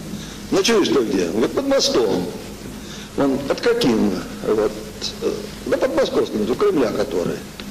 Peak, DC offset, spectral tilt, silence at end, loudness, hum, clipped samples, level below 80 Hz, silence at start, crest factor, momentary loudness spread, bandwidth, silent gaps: -8 dBFS; under 0.1%; -4.5 dB/octave; 0 s; -20 LUFS; none; under 0.1%; -44 dBFS; 0 s; 12 dB; 13 LU; 15 kHz; none